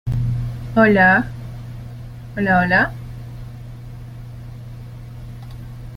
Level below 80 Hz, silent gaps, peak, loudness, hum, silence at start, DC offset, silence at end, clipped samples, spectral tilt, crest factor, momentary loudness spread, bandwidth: -38 dBFS; none; -2 dBFS; -16 LUFS; none; 0.05 s; under 0.1%; 0 s; under 0.1%; -8 dB/octave; 18 dB; 22 LU; 15.5 kHz